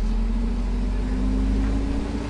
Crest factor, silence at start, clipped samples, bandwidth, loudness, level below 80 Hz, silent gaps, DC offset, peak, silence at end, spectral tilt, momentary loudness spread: 10 dB; 0 s; under 0.1%; 8.8 kHz; -26 LUFS; -24 dBFS; none; under 0.1%; -12 dBFS; 0 s; -7.5 dB/octave; 3 LU